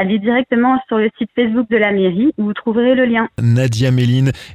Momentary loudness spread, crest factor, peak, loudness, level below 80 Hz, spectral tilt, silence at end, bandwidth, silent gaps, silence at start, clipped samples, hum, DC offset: 4 LU; 12 dB; -2 dBFS; -15 LUFS; -48 dBFS; -7.5 dB/octave; 0 s; 11 kHz; none; 0 s; under 0.1%; none; under 0.1%